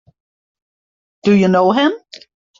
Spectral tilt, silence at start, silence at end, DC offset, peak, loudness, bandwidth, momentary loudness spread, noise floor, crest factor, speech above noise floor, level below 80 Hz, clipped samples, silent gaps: -7 dB/octave; 1.25 s; 0.65 s; under 0.1%; -2 dBFS; -14 LUFS; 7.4 kHz; 9 LU; under -90 dBFS; 16 dB; over 77 dB; -58 dBFS; under 0.1%; none